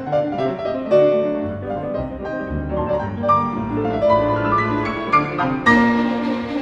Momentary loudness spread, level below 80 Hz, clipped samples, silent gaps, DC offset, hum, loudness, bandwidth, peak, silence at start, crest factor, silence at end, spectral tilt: 10 LU; -40 dBFS; under 0.1%; none; under 0.1%; none; -19 LUFS; 8.2 kHz; -2 dBFS; 0 s; 18 dB; 0 s; -7.5 dB/octave